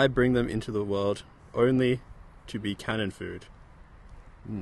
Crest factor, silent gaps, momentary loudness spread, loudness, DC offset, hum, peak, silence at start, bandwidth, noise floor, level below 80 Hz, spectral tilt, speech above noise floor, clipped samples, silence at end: 20 dB; none; 16 LU; -29 LUFS; under 0.1%; none; -10 dBFS; 0 s; 12 kHz; -50 dBFS; -48 dBFS; -6.5 dB/octave; 23 dB; under 0.1%; 0 s